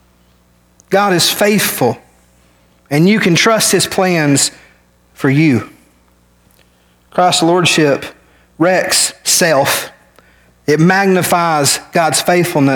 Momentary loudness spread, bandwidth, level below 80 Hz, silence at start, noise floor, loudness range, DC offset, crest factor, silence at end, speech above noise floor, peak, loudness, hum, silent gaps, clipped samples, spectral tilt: 8 LU; 19.5 kHz; -54 dBFS; 0.9 s; -52 dBFS; 3 LU; under 0.1%; 12 dB; 0 s; 40 dB; 0 dBFS; -12 LUFS; 60 Hz at -45 dBFS; none; under 0.1%; -3.5 dB/octave